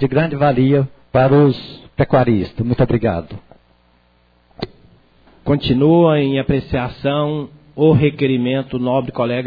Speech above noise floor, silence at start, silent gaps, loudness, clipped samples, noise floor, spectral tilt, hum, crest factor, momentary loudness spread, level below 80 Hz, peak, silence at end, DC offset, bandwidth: 40 dB; 0 s; none; -16 LUFS; under 0.1%; -56 dBFS; -10.5 dB/octave; 60 Hz at -45 dBFS; 14 dB; 17 LU; -40 dBFS; -2 dBFS; 0 s; under 0.1%; 5 kHz